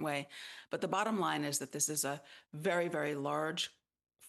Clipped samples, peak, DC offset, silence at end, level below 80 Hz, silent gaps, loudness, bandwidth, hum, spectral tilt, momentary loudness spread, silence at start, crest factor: under 0.1%; -18 dBFS; under 0.1%; 0 s; -86 dBFS; none; -36 LUFS; 12.5 kHz; none; -3 dB/octave; 11 LU; 0 s; 20 dB